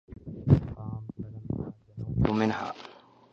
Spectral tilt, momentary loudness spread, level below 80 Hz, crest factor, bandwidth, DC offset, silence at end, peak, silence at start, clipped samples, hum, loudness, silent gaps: -8.5 dB/octave; 17 LU; -44 dBFS; 22 dB; 7 kHz; under 0.1%; 0.35 s; -8 dBFS; 0.1 s; under 0.1%; none; -29 LUFS; none